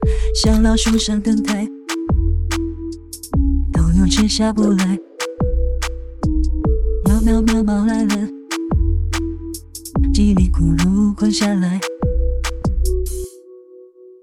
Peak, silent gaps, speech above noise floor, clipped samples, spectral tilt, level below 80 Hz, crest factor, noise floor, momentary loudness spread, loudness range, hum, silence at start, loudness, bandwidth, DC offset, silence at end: -2 dBFS; none; 27 dB; under 0.1%; -5.5 dB/octave; -20 dBFS; 14 dB; -42 dBFS; 11 LU; 1 LU; none; 0 s; -18 LUFS; 15.5 kHz; under 0.1%; 0.15 s